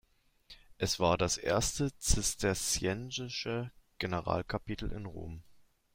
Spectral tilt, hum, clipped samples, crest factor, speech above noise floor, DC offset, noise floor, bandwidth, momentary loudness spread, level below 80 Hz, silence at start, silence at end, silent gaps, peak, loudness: -3.5 dB/octave; none; under 0.1%; 22 dB; 28 dB; under 0.1%; -62 dBFS; 16 kHz; 14 LU; -46 dBFS; 0.5 s; 0.35 s; none; -12 dBFS; -33 LUFS